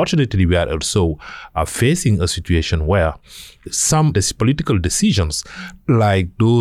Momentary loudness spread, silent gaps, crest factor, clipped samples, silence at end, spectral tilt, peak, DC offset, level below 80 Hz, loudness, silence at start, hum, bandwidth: 11 LU; none; 12 dB; under 0.1%; 0 s; -5 dB/octave; -6 dBFS; under 0.1%; -30 dBFS; -17 LUFS; 0 s; none; 15 kHz